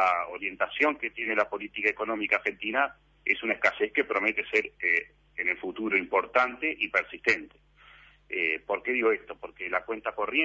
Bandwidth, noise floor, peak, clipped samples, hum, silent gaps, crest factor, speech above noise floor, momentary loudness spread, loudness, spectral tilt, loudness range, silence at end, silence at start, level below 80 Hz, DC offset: 8 kHz; -56 dBFS; -8 dBFS; under 0.1%; none; none; 22 dB; 27 dB; 6 LU; -28 LUFS; -4 dB/octave; 2 LU; 0 s; 0 s; -64 dBFS; under 0.1%